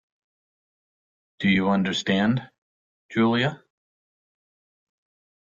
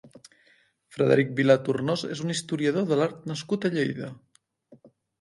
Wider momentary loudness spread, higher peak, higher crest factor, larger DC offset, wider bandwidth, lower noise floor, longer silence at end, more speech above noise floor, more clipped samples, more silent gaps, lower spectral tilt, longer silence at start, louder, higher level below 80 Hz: second, 7 LU vs 11 LU; about the same, -8 dBFS vs -6 dBFS; about the same, 18 dB vs 22 dB; neither; second, 7.6 kHz vs 11.5 kHz; first, under -90 dBFS vs -63 dBFS; first, 1.85 s vs 0.35 s; first, over 68 dB vs 38 dB; neither; first, 2.58-3.09 s vs none; about the same, -6 dB/octave vs -6 dB/octave; first, 1.4 s vs 0.05 s; about the same, -23 LUFS vs -25 LUFS; first, -62 dBFS vs -70 dBFS